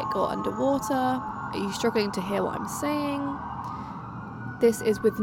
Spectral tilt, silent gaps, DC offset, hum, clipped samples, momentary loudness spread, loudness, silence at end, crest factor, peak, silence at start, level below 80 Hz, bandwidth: -5.5 dB/octave; none; under 0.1%; none; under 0.1%; 12 LU; -28 LUFS; 0 s; 18 dB; -10 dBFS; 0 s; -56 dBFS; 17.5 kHz